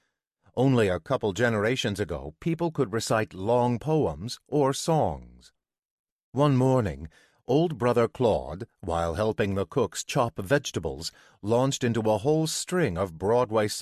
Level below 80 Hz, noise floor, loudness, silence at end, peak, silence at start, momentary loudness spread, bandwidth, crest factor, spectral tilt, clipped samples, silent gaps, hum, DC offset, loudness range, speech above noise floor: -48 dBFS; -67 dBFS; -26 LUFS; 0 s; -10 dBFS; 0.55 s; 10 LU; 14 kHz; 16 dB; -5.5 dB/octave; under 0.1%; 5.91-6.04 s, 6.12-6.33 s; none; under 0.1%; 1 LU; 41 dB